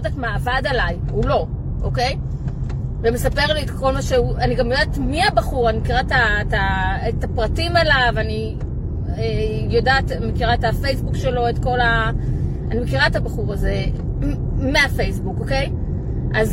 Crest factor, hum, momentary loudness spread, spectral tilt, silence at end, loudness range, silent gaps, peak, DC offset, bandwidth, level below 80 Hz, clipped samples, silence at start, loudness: 16 dB; none; 8 LU; -6 dB/octave; 0 s; 3 LU; none; -2 dBFS; under 0.1%; 16.5 kHz; -26 dBFS; under 0.1%; 0 s; -20 LUFS